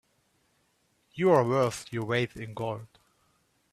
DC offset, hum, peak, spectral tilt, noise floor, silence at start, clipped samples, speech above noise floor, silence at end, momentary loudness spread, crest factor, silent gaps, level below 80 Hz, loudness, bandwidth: under 0.1%; none; -10 dBFS; -6 dB/octave; -71 dBFS; 1.15 s; under 0.1%; 44 dB; 0.85 s; 13 LU; 22 dB; none; -66 dBFS; -28 LUFS; 14 kHz